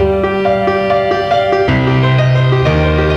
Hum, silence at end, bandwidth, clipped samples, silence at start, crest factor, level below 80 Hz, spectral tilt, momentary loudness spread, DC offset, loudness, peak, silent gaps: none; 0 s; 6.8 kHz; under 0.1%; 0 s; 10 dB; -26 dBFS; -7.5 dB/octave; 2 LU; under 0.1%; -12 LUFS; -2 dBFS; none